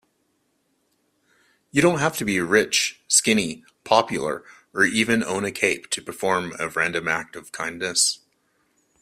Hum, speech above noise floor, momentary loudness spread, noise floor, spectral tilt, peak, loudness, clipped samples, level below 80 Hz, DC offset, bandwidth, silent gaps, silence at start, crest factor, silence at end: none; 47 dB; 12 LU; -70 dBFS; -2.5 dB/octave; -2 dBFS; -22 LUFS; under 0.1%; -60 dBFS; under 0.1%; 16 kHz; none; 1.75 s; 22 dB; 0.85 s